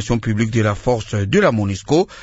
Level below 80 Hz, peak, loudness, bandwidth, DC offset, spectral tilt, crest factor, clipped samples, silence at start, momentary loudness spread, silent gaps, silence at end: -38 dBFS; -2 dBFS; -18 LUFS; 8 kHz; under 0.1%; -6.5 dB/octave; 16 dB; under 0.1%; 0 s; 5 LU; none; 0 s